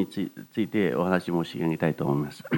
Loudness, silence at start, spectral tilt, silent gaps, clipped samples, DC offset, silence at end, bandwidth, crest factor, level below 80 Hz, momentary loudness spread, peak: -27 LUFS; 0 s; -7.5 dB/octave; none; under 0.1%; under 0.1%; 0 s; 19 kHz; 20 dB; -64 dBFS; 6 LU; -6 dBFS